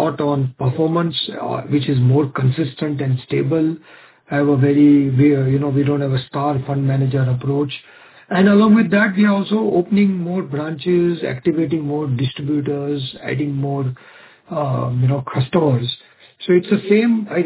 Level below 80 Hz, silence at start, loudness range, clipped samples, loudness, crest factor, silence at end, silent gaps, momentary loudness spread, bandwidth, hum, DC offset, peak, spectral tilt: -54 dBFS; 0 s; 5 LU; under 0.1%; -18 LUFS; 14 dB; 0 s; none; 10 LU; 4 kHz; none; under 0.1%; -2 dBFS; -12 dB/octave